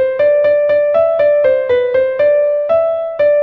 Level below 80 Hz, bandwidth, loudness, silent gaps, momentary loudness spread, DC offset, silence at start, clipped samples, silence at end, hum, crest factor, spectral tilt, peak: -52 dBFS; 4.5 kHz; -13 LUFS; none; 3 LU; under 0.1%; 0 s; under 0.1%; 0 s; none; 10 dB; -6.5 dB/octave; -2 dBFS